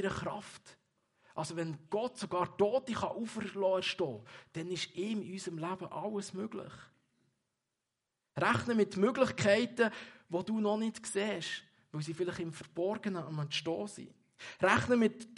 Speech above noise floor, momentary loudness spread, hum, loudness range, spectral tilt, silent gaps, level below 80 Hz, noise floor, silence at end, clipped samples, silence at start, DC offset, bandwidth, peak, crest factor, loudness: 53 dB; 16 LU; none; 8 LU; -5 dB/octave; none; -70 dBFS; -88 dBFS; 0 s; under 0.1%; 0 s; under 0.1%; 11.5 kHz; -12 dBFS; 24 dB; -35 LUFS